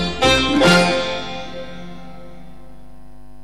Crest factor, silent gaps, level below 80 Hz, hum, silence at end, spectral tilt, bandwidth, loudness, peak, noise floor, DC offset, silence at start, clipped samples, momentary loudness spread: 16 dB; none; -38 dBFS; none; 0.9 s; -4 dB/octave; 15 kHz; -15 LUFS; -4 dBFS; -43 dBFS; 3%; 0 s; under 0.1%; 23 LU